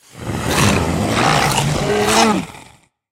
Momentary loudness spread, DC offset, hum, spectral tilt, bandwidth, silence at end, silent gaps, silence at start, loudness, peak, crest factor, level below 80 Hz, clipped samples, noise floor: 10 LU; under 0.1%; none; -4 dB/octave; 16 kHz; 0.5 s; none; 0.15 s; -15 LUFS; 0 dBFS; 16 dB; -36 dBFS; under 0.1%; -47 dBFS